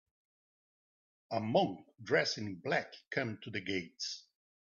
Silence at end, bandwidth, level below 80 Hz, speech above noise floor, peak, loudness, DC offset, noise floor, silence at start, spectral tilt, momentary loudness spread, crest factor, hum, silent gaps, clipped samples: 0.45 s; 7.4 kHz; -78 dBFS; over 54 dB; -18 dBFS; -36 LUFS; under 0.1%; under -90 dBFS; 1.3 s; -4.5 dB/octave; 9 LU; 20 dB; none; none; under 0.1%